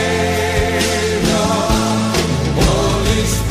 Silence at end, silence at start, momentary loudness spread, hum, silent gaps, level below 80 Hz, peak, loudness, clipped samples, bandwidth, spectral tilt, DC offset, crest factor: 0 s; 0 s; 2 LU; none; none; -24 dBFS; -2 dBFS; -15 LUFS; under 0.1%; 15.5 kHz; -4.5 dB/octave; 0.7%; 14 dB